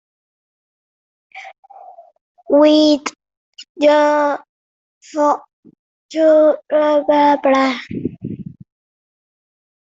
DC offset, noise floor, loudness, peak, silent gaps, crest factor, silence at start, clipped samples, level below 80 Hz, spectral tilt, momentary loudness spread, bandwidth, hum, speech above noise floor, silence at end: under 0.1%; under -90 dBFS; -15 LUFS; -2 dBFS; 1.58-1.63 s, 2.21-2.35 s, 3.37-3.53 s, 3.69-3.75 s, 4.49-5.01 s, 5.53-5.63 s, 5.79-6.09 s; 16 dB; 1.35 s; under 0.1%; -62 dBFS; -5 dB/octave; 18 LU; 7.8 kHz; none; over 76 dB; 1.4 s